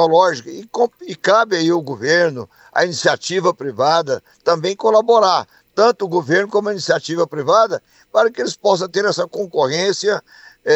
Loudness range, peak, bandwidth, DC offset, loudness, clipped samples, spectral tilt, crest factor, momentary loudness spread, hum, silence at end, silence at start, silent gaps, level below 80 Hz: 2 LU; -2 dBFS; 8.4 kHz; under 0.1%; -17 LUFS; under 0.1%; -4 dB/octave; 16 dB; 7 LU; none; 0 s; 0 s; none; -70 dBFS